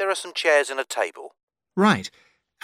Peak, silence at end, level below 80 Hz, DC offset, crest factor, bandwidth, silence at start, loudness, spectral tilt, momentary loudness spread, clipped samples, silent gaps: -6 dBFS; 0.55 s; -74 dBFS; under 0.1%; 18 dB; 15 kHz; 0 s; -22 LUFS; -4 dB/octave; 14 LU; under 0.1%; 1.43-1.48 s